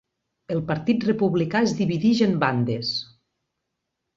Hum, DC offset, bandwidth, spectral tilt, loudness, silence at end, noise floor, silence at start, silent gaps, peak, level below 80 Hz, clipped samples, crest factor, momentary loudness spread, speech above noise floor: none; under 0.1%; 7.6 kHz; -6.5 dB/octave; -23 LUFS; 1.15 s; -80 dBFS; 0.5 s; none; -6 dBFS; -60 dBFS; under 0.1%; 18 dB; 8 LU; 58 dB